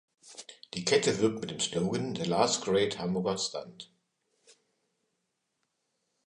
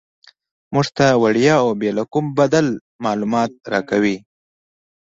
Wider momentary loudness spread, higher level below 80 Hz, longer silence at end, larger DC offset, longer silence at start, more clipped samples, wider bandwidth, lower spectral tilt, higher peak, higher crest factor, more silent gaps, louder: first, 21 LU vs 9 LU; second, -66 dBFS vs -56 dBFS; first, 2.4 s vs 0.85 s; neither; second, 0.25 s vs 0.7 s; neither; first, 11 kHz vs 7.8 kHz; second, -4 dB/octave vs -6 dB/octave; second, -10 dBFS vs -2 dBFS; first, 22 dB vs 16 dB; second, none vs 2.81-2.99 s; second, -29 LUFS vs -18 LUFS